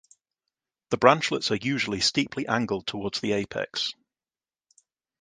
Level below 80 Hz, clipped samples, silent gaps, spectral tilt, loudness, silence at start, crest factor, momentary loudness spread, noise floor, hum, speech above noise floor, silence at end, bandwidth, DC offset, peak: -60 dBFS; under 0.1%; none; -4 dB/octave; -25 LUFS; 0.9 s; 26 dB; 10 LU; under -90 dBFS; none; over 64 dB; 1.3 s; 10 kHz; under 0.1%; -2 dBFS